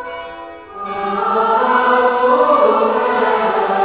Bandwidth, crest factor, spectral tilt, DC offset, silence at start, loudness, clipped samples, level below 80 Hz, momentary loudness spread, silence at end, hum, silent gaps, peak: 4 kHz; 14 dB; -8 dB/octave; 0.1%; 0 s; -14 LUFS; under 0.1%; -54 dBFS; 17 LU; 0 s; none; none; -2 dBFS